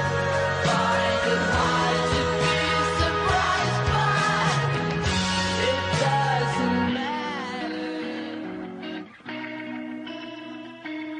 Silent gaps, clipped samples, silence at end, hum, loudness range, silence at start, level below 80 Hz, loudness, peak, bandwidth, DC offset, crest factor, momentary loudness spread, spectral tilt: none; under 0.1%; 0 s; none; 10 LU; 0 s; -46 dBFS; -24 LUFS; -10 dBFS; 10.5 kHz; under 0.1%; 14 dB; 13 LU; -4.5 dB/octave